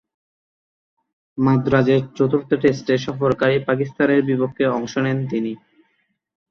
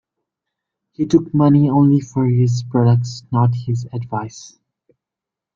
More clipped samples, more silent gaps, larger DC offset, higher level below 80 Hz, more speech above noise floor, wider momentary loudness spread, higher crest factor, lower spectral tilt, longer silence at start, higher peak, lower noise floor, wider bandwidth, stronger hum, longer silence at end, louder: neither; neither; neither; about the same, -54 dBFS vs -54 dBFS; second, 49 dB vs 70 dB; second, 7 LU vs 12 LU; about the same, 18 dB vs 16 dB; about the same, -7.5 dB/octave vs -8.5 dB/octave; first, 1.35 s vs 1 s; about the same, -4 dBFS vs -2 dBFS; second, -68 dBFS vs -86 dBFS; about the same, 6.8 kHz vs 7.4 kHz; neither; second, 0.95 s vs 1.1 s; about the same, -19 LUFS vs -17 LUFS